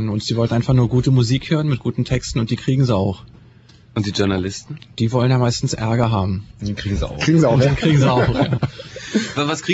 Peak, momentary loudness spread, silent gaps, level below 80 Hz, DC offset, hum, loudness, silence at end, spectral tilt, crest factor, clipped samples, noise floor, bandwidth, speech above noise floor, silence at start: -2 dBFS; 11 LU; none; -38 dBFS; under 0.1%; none; -18 LUFS; 0 s; -6.5 dB/octave; 16 dB; under 0.1%; -47 dBFS; 8 kHz; 29 dB; 0 s